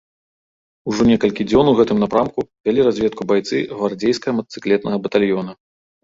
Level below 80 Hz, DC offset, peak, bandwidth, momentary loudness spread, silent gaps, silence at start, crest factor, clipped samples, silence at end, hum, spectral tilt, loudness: -48 dBFS; under 0.1%; -2 dBFS; 7.8 kHz; 8 LU; 2.60-2.64 s; 0.85 s; 16 dB; under 0.1%; 0.5 s; none; -6.5 dB/octave; -18 LUFS